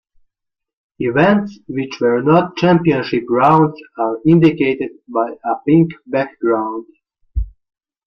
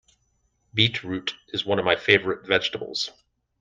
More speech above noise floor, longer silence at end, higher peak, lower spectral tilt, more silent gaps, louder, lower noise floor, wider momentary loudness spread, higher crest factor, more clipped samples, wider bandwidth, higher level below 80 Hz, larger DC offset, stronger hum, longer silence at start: first, 64 dB vs 45 dB; about the same, 0.6 s vs 0.5 s; about the same, 0 dBFS vs -2 dBFS; first, -8.5 dB/octave vs -4.5 dB/octave; neither; first, -16 LUFS vs -23 LUFS; first, -79 dBFS vs -70 dBFS; about the same, 13 LU vs 11 LU; second, 16 dB vs 24 dB; neither; second, 6.4 kHz vs 9.6 kHz; first, -36 dBFS vs -60 dBFS; neither; neither; first, 1 s vs 0.75 s